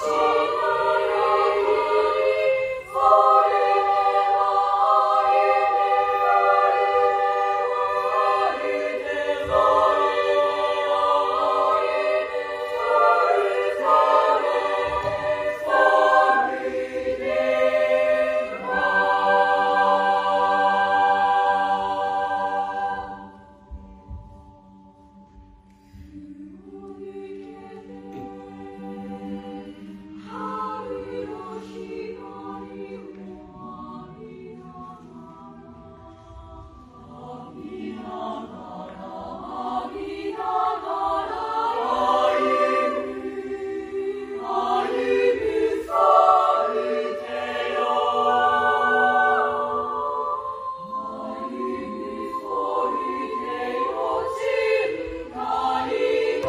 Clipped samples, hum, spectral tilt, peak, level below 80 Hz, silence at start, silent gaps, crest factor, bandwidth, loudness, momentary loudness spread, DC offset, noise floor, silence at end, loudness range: under 0.1%; none; -4.5 dB/octave; -4 dBFS; -54 dBFS; 0 s; none; 20 dB; 14.5 kHz; -21 LUFS; 20 LU; under 0.1%; -51 dBFS; 0 s; 19 LU